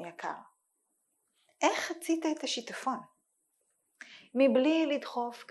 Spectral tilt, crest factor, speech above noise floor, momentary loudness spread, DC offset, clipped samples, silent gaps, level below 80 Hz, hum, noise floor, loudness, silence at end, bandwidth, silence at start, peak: -3 dB/octave; 20 dB; 48 dB; 15 LU; under 0.1%; under 0.1%; none; -86 dBFS; none; -79 dBFS; -31 LUFS; 0.05 s; 12.5 kHz; 0 s; -14 dBFS